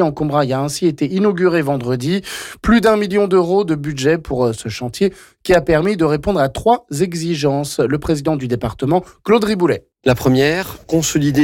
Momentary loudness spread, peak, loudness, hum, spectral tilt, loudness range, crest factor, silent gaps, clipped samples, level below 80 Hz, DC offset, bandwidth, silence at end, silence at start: 6 LU; -4 dBFS; -17 LUFS; none; -5.5 dB/octave; 2 LU; 12 dB; none; under 0.1%; -38 dBFS; under 0.1%; 17 kHz; 0 s; 0 s